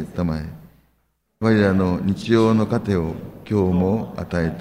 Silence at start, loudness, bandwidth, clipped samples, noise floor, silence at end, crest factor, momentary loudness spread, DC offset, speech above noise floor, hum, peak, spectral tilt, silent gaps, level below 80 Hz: 0 s; -20 LUFS; 15 kHz; under 0.1%; -67 dBFS; 0 s; 16 dB; 10 LU; under 0.1%; 47 dB; none; -4 dBFS; -8 dB/octave; none; -46 dBFS